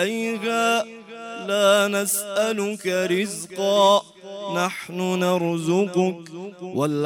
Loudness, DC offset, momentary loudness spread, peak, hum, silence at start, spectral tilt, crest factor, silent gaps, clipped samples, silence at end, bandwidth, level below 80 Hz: -22 LUFS; under 0.1%; 16 LU; -6 dBFS; none; 0 s; -4 dB/octave; 18 dB; none; under 0.1%; 0 s; 16.5 kHz; -74 dBFS